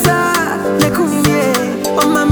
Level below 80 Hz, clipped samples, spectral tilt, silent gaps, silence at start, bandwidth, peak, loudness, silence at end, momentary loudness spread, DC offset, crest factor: -40 dBFS; under 0.1%; -4.5 dB/octave; none; 0 s; over 20 kHz; 0 dBFS; -14 LUFS; 0 s; 3 LU; under 0.1%; 12 dB